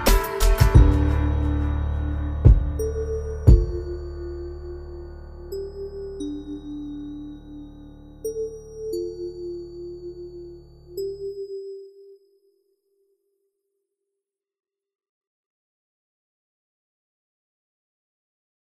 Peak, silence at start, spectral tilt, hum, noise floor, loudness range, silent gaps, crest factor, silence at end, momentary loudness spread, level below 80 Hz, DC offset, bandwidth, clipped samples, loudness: -4 dBFS; 0 s; -6.5 dB/octave; none; -86 dBFS; 17 LU; none; 20 dB; 6.65 s; 21 LU; -26 dBFS; under 0.1%; 15.5 kHz; under 0.1%; -24 LUFS